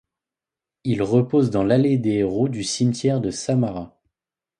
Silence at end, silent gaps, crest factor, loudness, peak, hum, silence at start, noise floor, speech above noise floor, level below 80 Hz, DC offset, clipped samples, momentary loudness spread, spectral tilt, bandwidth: 0.7 s; none; 16 dB; -21 LUFS; -4 dBFS; none; 0.85 s; -89 dBFS; 69 dB; -52 dBFS; under 0.1%; under 0.1%; 8 LU; -6.5 dB/octave; 11 kHz